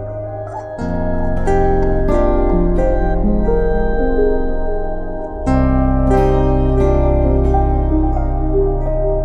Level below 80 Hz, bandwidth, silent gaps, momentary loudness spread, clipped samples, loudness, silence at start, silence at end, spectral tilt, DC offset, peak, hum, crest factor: -18 dBFS; 7.2 kHz; none; 9 LU; under 0.1%; -17 LUFS; 0 s; 0 s; -9.5 dB/octave; under 0.1%; -2 dBFS; none; 12 dB